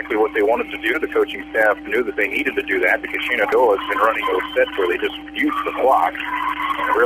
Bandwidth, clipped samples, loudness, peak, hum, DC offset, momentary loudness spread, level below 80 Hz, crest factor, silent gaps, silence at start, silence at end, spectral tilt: 15.5 kHz; under 0.1%; -19 LUFS; -4 dBFS; none; under 0.1%; 5 LU; -50 dBFS; 16 dB; none; 0 s; 0 s; -4 dB/octave